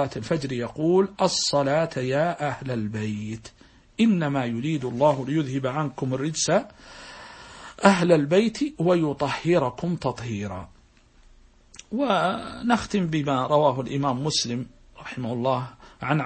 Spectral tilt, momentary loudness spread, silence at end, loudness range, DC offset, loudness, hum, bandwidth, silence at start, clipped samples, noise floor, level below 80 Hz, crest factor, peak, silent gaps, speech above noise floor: -5.5 dB/octave; 17 LU; 0 s; 5 LU; under 0.1%; -24 LUFS; none; 8.8 kHz; 0 s; under 0.1%; -55 dBFS; -54 dBFS; 22 dB; -2 dBFS; none; 32 dB